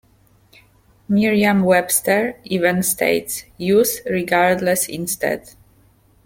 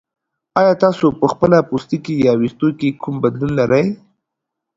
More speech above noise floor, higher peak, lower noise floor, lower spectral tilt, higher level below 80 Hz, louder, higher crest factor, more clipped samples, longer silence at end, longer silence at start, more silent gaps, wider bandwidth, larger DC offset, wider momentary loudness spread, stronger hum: second, 37 dB vs 65 dB; about the same, -2 dBFS vs 0 dBFS; second, -55 dBFS vs -80 dBFS; second, -4 dB/octave vs -8 dB/octave; about the same, -54 dBFS vs -50 dBFS; about the same, -18 LUFS vs -16 LUFS; about the same, 18 dB vs 16 dB; neither; about the same, 0.75 s vs 0.8 s; first, 1.1 s vs 0.55 s; neither; first, 17 kHz vs 7.8 kHz; neither; about the same, 7 LU vs 8 LU; neither